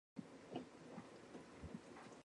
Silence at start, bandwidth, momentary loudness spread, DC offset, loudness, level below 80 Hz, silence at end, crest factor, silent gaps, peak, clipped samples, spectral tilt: 0.15 s; 11 kHz; 5 LU; under 0.1%; -56 LUFS; -72 dBFS; 0 s; 22 dB; none; -34 dBFS; under 0.1%; -5.5 dB/octave